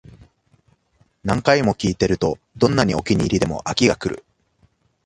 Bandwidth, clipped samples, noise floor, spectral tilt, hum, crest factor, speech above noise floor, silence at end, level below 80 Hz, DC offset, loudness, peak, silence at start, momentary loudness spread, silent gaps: 11.5 kHz; under 0.1%; -61 dBFS; -5.5 dB/octave; none; 20 dB; 43 dB; 0.9 s; -42 dBFS; under 0.1%; -20 LUFS; 0 dBFS; 1.25 s; 8 LU; none